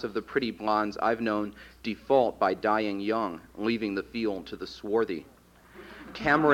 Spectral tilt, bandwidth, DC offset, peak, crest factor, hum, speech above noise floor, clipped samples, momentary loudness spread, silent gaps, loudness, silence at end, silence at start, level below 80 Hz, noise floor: -6.5 dB/octave; 16.5 kHz; under 0.1%; -8 dBFS; 20 dB; none; 24 dB; under 0.1%; 13 LU; none; -29 LUFS; 0 s; 0 s; -58 dBFS; -52 dBFS